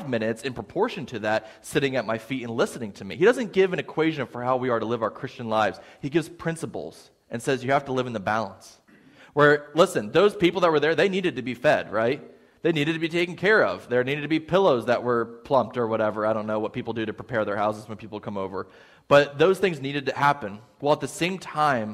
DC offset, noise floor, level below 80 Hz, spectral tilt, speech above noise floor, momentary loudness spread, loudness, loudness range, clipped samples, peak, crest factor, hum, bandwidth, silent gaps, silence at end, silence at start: under 0.1%; -53 dBFS; -62 dBFS; -5.5 dB/octave; 29 dB; 11 LU; -24 LUFS; 5 LU; under 0.1%; -4 dBFS; 20 dB; none; 15 kHz; none; 0 s; 0 s